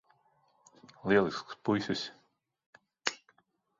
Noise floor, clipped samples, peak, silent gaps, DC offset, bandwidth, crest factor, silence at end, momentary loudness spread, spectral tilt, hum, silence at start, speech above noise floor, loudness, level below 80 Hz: -72 dBFS; under 0.1%; -6 dBFS; 2.66-2.73 s; under 0.1%; 7.8 kHz; 28 dB; 0.65 s; 14 LU; -4.5 dB/octave; none; 1.05 s; 41 dB; -33 LUFS; -68 dBFS